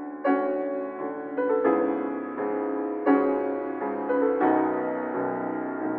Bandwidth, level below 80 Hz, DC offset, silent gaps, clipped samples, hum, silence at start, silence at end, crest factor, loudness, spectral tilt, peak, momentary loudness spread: 4.2 kHz; -72 dBFS; under 0.1%; none; under 0.1%; none; 0 s; 0 s; 18 dB; -26 LUFS; -6 dB/octave; -8 dBFS; 8 LU